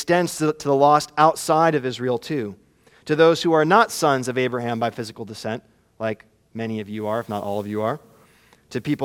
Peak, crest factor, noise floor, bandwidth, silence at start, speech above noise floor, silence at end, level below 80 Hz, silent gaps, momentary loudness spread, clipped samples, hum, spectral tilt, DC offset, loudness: -2 dBFS; 20 dB; -55 dBFS; 17 kHz; 0 s; 34 dB; 0 s; -64 dBFS; none; 16 LU; under 0.1%; none; -5 dB/octave; under 0.1%; -21 LUFS